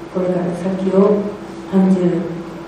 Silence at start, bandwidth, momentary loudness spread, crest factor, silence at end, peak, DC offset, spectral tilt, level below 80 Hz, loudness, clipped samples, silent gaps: 0 s; 9.4 kHz; 11 LU; 16 dB; 0 s; -2 dBFS; under 0.1%; -9 dB/octave; -50 dBFS; -17 LUFS; under 0.1%; none